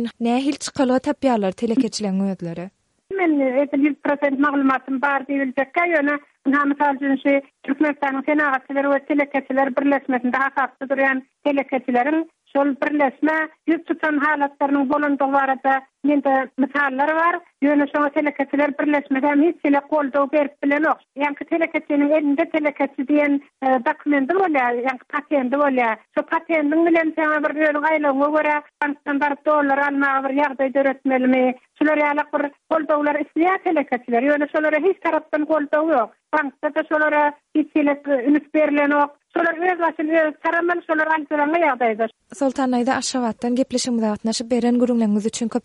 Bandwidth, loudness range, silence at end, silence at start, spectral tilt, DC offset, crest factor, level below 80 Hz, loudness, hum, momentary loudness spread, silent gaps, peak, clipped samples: 11 kHz; 2 LU; 0.05 s; 0 s; -5 dB/octave; under 0.1%; 14 dB; -68 dBFS; -20 LUFS; none; 5 LU; none; -6 dBFS; under 0.1%